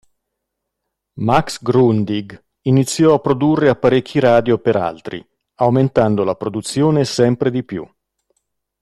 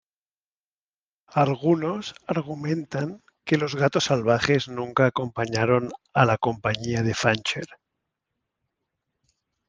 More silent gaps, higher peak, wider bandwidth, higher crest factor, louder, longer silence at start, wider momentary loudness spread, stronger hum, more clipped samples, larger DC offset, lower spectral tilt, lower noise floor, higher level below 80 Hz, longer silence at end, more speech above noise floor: neither; about the same, 0 dBFS vs -2 dBFS; first, 12.5 kHz vs 9.8 kHz; second, 16 dB vs 22 dB; first, -16 LUFS vs -24 LUFS; second, 1.15 s vs 1.3 s; about the same, 11 LU vs 9 LU; neither; neither; neither; about the same, -6.5 dB/octave vs -5.5 dB/octave; second, -77 dBFS vs under -90 dBFS; first, -48 dBFS vs -60 dBFS; second, 0.95 s vs 1.95 s; second, 62 dB vs over 66 dB